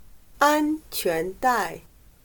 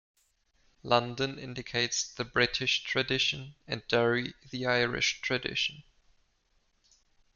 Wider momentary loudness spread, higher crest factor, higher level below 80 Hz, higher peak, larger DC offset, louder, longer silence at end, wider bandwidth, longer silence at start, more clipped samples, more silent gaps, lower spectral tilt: second, 8 LU vs 11 LU; about the same, 20 dB vs 24 dB; first, -52 dBFS vs -60 dBFS; first, -4 dBFS vs -8 dBFS; neither; first, -24 LUFS vs -29 LUFS; second, 0.45 s vs 1.55 s; first, 19.5 kHz vs 7.4 kHz; second, 0.15 s vs 0.85 s; neither; neither; about the same, -3.5 dB/octave vs -3 dB/octave